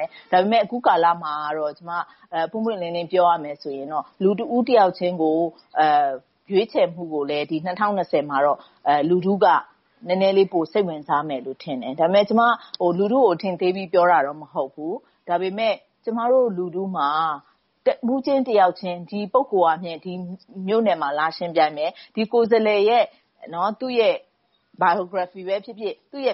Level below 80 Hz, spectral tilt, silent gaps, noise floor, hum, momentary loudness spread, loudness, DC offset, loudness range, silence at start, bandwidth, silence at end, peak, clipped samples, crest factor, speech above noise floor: -72 dBFS; -4 dB/octave; none; -61 dBFS; none; 12 LU; -21 LUFS; under 0.1%; 3 LU; 0 s; 5.8 kHz; 0 s; -4 dBFS; under 0.1%; 16 dB; 40 dB